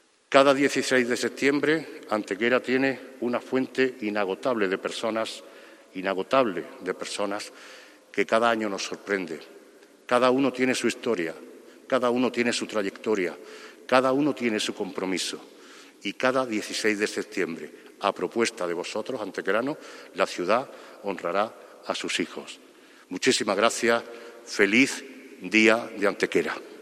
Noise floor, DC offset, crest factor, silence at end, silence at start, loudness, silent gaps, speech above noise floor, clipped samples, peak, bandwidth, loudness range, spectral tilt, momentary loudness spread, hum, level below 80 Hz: -53 dBFS; under 0.1%; 26 dB; 0 s; 0.3 s; -26 LUFS; none; 27 dB; under 0.1%; -2 dBFS; 15 kHz; 5 LU; -3.5 dB/octave; 17 LU; none; -74 dBFS